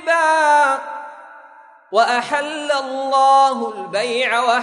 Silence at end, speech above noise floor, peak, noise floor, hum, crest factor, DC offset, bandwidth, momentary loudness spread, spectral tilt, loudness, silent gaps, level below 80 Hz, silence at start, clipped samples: 0 s; 28 dB; -2 dBFS; -45 dBFS; none; 16 dB; under 0.1%; 11 kHz; 11 LU; -1.5 dB/octave; -17 LUFS; none; -74 dBFS; 0 s; under 0.1%